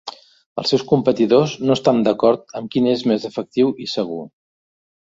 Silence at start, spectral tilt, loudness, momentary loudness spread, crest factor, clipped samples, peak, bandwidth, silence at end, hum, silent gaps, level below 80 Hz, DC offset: 0.05 s; -6.5 dB/octave; -18 LUFS; 9 LU; 16 dB; under 0.1%; -2 dBFS; 7.8 kHz; 0.75 s; none; 0.46-0.56 s; -60 dBFS; under 0.1%